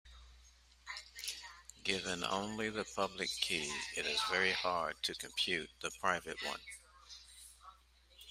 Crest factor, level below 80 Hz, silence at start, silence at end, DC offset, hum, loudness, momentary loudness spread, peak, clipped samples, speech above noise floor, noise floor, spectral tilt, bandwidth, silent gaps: 24 dB; -66 dBFS; 0.05 s; 0 s; under 0.1%; none; -37 LUFS; 20 LU; -16 dBFS; under 0.1%; 26 dB; -65 dBFS; -2 dB/octave; 16 kHz; none